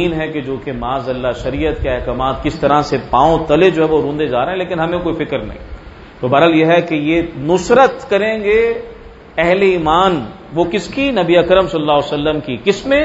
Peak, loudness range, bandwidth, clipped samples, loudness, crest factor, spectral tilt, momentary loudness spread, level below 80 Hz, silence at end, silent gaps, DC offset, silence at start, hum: 0 dBFS; 2 LU; 8 kHz; under 0.1%; -15 LUFS; 14 dB; -6 dB/octave; 11 LU; -34 dBFS; 0 s; none; under 0.1%; 0 s; none